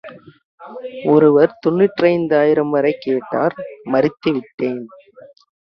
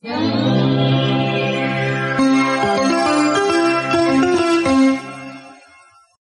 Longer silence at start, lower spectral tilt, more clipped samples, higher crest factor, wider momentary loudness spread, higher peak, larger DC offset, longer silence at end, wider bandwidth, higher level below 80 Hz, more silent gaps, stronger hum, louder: about the same, 0.05 s vs 0.05 s; first, -9 dB/octave vs -5.5 dB/octave; neither; about the same, 16 dB vs 12 dB; first, 18 LU vs 4 LU; first, 0 dBFS vs -6 dBFS; neither; about the same, 0.8 s vs 0.7 s; second, 5.8 kHz vs 11.5 kHz; second, -60 dBFS vs -54 dBFS; first, 0.45-0.58 s, 4.54-4.58 s vs none; neither; about the same, -16 LUFS vs -16 LUFS